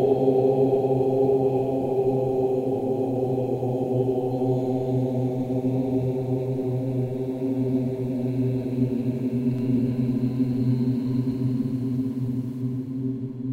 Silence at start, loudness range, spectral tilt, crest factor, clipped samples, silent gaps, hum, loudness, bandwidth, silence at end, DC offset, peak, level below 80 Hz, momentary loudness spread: 0 s; 3 LU; -10.5 dB/octave; 16 dB; under 0.1%; none; none; -25 LUFS; 7 kHz; 0 s; under 0.1%; -8 dBFS; -54 dBFS; 6 LU